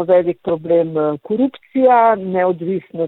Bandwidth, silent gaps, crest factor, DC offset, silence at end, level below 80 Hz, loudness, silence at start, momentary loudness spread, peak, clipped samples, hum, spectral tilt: 4.1 kHz; none; 12 dB; under 0.1%; 0 s; -60 dBFS; -16 LUFS; 0 s; 9 LU; -2 dBFS; under 0.1%; none; -10 dB/octave